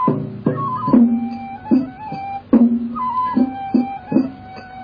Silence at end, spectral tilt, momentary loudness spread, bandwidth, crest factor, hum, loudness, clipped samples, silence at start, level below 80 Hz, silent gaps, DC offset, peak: 0 s; -10.5 dB/octave; 14 LU; 5 kHz; 16 dB; none; -18 LUFS; under 0.1%; 0 s; -52 dBFS; none; under 0.1%; -2 dBFS